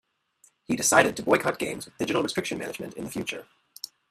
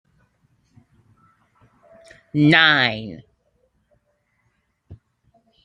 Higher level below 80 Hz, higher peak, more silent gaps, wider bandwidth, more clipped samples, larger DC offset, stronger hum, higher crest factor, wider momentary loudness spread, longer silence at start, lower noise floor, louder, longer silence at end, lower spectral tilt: about the same, -62 dBFS vs -62 dBFS; about the same, -2 dBFS vs -2 dBFS; neither; first, 15.5 kHz vs 9.8 kHz; neither; neither; neither; about the same, 26 dB vs 24 dB; second, 19 LU vs 24 LU; second, 0.7 s vs 2.35 s; second, -63 dBFS vs -69 dBFS; second, -26 LUFS vs -16 LUFS; second, 0.25 s vs 0.7 s; second, -3 dB/octave vs -6 dB/octave